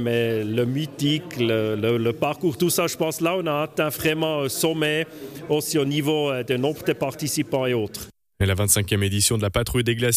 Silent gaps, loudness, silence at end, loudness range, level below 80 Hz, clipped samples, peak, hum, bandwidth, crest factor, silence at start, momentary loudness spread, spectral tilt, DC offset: none; -23 LUFS; 0 s; 1 LU; -46 dBFS; under 0.1%; -6 dBFS; none; 15.5 kHz; 18 dB; 0 s; 6 LU; -4.5 dB/octave; under 0.1%